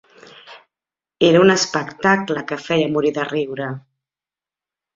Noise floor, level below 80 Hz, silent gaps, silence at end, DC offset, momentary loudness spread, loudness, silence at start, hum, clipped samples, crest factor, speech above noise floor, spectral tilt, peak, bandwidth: under -90 dBFS; -60 dBFS; none; 1.15 s; under 0.1%; 13 LU; -18 LUFS; 0.45 s; none; under 0.1%; 18 dB; over 73 dB; -4.5 dB/octave; -2 dBFS; 7.8 kHz